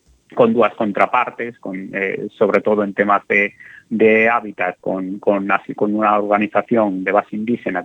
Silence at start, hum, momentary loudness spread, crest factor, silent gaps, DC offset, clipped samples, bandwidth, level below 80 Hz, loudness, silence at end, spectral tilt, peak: 0.3 s; none; 9 LU; 18 dB; none; under 0.1%; under 0.1%; 7.8 kHz; -64 dBFS; -17 LUFS; 0 s; -8 dB/octave; 0 dBFS